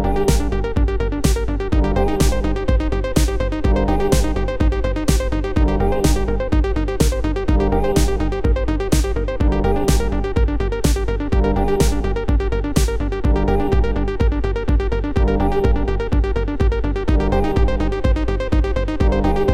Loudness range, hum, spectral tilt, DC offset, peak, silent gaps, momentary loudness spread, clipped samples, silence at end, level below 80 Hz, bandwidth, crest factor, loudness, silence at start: 1 LU; none; -6.5 dB/octave; under 0.1%; -2 dBFS; none; 3 LU; under 0.1%; 0 s; -20 dBFS; 15.5 kHz; 14 dB; -19 LUFS; 0 s